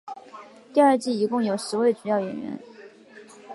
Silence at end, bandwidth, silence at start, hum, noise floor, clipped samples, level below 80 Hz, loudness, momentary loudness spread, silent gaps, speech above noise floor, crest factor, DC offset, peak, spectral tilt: 0 s; 11.5 kHz; 0.05 s; none; -48 dBFS; under 0.1%; -76 dBFS; -23 LUFS; 21 LU; none; 25 dB; 18 dB; under 0.1%; -6 dBFS; -5.5 dB/octave